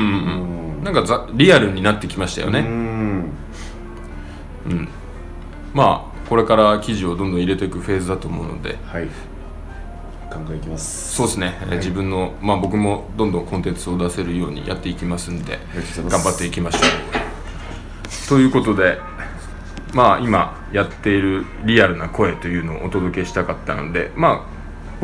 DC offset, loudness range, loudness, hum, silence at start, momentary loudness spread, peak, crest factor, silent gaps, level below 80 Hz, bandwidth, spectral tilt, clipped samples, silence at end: under 0.1%; 7 LU; -19 LUFS; none; 0 s; 20 LU; 0 dBFS; 20 dB; none; -34 dBFS; 10.5 kHz; -5 dB/octave; under 0.1%; 0 s